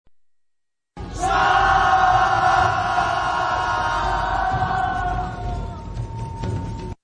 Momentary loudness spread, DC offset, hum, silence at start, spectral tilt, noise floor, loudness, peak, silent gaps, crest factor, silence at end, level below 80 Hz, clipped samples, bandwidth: 15 LU; under 0.1%; none; 0.95 s; -4.5 dB/octave; -73 dBFS; -20 LUFS; -4 dBFS; none; 16 dB; 0.1 s; -34 dBFS; under 0.1%; 10.5 kHz